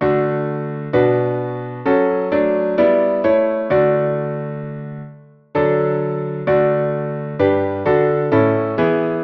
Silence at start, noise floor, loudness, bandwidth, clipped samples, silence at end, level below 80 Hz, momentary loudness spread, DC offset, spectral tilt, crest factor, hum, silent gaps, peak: 0 s; -41 dBFS; -18 LUFS; 5.4 kHz; under 0.1%; 0 s; -52 dBFS; 10 LU; under 0.1%; -10.5 dB/octave; 14 dB; none; none; -2 dBFS